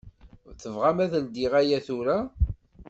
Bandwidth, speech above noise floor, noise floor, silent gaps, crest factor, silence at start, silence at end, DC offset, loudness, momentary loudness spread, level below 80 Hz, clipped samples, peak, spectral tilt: 8 kHz; 25 dB; -50 dBFS; none; 18 dB; 0.05 s; 0.05 s; under 0.1%; -26 LUFS; 7 LU; -36 dBFS; under 0.1%; -10 dBFS; -7 dB/octave